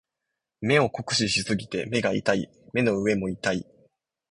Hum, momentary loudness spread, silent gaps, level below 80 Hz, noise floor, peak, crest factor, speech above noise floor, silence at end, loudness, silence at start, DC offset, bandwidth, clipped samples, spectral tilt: none; 6 LU; none; -56 dBFS; -84 dBFS; -6 dBFS; 20 dB; 59 dB; 0.7 s; -25 LUFS; 0.6 s; under 0.1%; 11.5 kHz; under 0.1%; -4.5 dB/octave